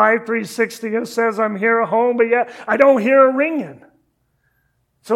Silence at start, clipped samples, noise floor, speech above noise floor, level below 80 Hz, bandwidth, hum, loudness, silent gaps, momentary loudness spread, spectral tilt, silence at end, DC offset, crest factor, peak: 0 s; under 0.1%; -65 dBFS; 49 dB; -68 dBFS; 14 kHz; none; -16 LUFS; none; 10 LU; -5.5 dB/octave; 0 s; under 0.1%; 18 dB; 0 dBFS